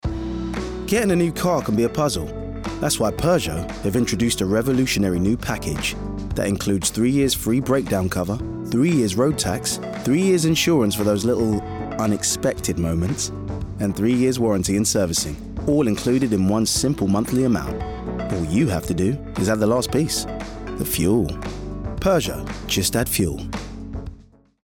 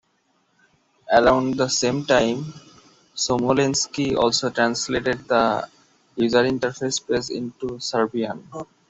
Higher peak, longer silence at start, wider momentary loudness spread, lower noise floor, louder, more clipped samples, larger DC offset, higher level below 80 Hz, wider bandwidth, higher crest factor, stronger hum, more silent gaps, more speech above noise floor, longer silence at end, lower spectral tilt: second, -8 dBFS vs -2 dBFS; second, 0.05 s vs 1.05 s; about the same, 10 LU vs 11 LU; second, -47 dBFS vs -66 dBFS; about the same, -21 LUFS vs -21 LUFS; neither; neither; first, -38 dBFS vs -52 dBFS; first, 19 kHz vs 8.2 kHz; second, 12 dB vs 20 dB; neither; neither; second, 27 dB vs 45 dB; first, 0.45 s vs 0.25 s; first, -5 dB/octave vs -3.5 dB/octave